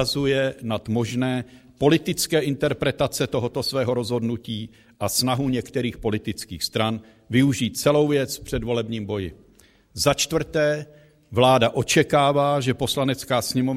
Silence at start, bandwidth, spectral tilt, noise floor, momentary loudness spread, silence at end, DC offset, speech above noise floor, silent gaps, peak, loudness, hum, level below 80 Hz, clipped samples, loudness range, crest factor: 0 s; 16 kHz; -4.5 dB/octave; -55 dBFS; 11 LU; 0 s; under 0.1%; 33 dB; none; -2 dBFS; -23 LUFS; none; -48 dBFS; under 0.1%; 4 LU; 20 dB